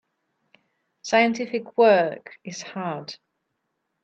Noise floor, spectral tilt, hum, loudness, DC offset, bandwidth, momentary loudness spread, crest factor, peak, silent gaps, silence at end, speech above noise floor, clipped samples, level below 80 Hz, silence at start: -77 dBFS; -4.5 dB/octave; none; -22 LUFS; under 0.1%; 8.2 kHz; 21 LU; 20 dB; -6 dBFS; none; 0.9 s; 55 dB; under 0.1%; -76 dBFS; 1.05 s